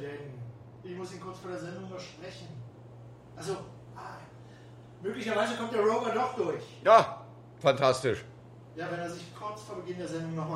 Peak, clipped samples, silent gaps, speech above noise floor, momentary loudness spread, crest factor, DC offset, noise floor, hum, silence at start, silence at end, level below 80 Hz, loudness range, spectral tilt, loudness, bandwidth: -8 dBFS; under 0.1%; none; 20 dB; 24 LU; 24 dB; under 0.1%; -50 dBFS; none; 0 s; 0 s; -66 dBFS; 16 LU; -5 dB/octave; -30 LUFS; 12.5 kHz